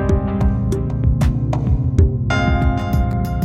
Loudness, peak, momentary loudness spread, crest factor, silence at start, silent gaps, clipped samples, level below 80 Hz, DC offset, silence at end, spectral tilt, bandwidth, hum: -18 LUFS; 0 dBFS; 3 LU; 16 dB; 0 s; none; under 0.1%; -22 dBFS; under 0.1%; 0 s; -8 dB/octave; 15 kHz; none